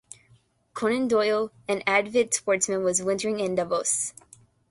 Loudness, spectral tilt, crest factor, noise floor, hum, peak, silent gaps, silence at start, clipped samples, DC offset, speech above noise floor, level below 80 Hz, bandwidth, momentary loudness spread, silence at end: -25 LUFS; -3 dB/octave; 18 dB; -61 dBFS; none; -8 dBFS; none; 0.75 s; under 0.1%; under 0.1%; 36 dB; -66 dBFS; 12 kHz; 6 LU; 0.6 s